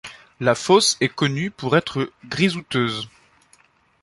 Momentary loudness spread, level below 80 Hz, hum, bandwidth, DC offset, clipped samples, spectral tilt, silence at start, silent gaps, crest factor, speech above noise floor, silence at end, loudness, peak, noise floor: 12 LU; -58 dBFS; none; 11.5 kHz; under 0.1%; under 0.1%; -4 dB/octave; 0.05 s; none; 20 dB; 37 dB; 0.95 s; -21 LUFS; -2 dBFS; -58 dBFS